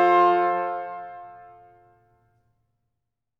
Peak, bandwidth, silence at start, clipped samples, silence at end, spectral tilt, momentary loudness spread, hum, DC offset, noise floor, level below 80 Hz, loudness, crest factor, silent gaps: -8 dBFS; 6 kHz; 0 s; under 0.1%; 2 s; -6.5 dB/octave; 24 LU; none; under 0.1%; -82 dBFS; -74 dBFS; -22 LUFS; 18 dB; none